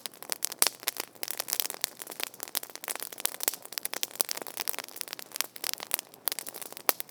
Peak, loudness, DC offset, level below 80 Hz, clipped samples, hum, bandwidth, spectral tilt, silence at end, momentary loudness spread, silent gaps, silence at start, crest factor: 0 dBFS; -32 LUFS; under 0.1%; under -90 dBFS; under 0.1%; none; over 20 kHz; 1.5 dB/octave; 0.05 s; 9 LU; none; 0 s; 34 dB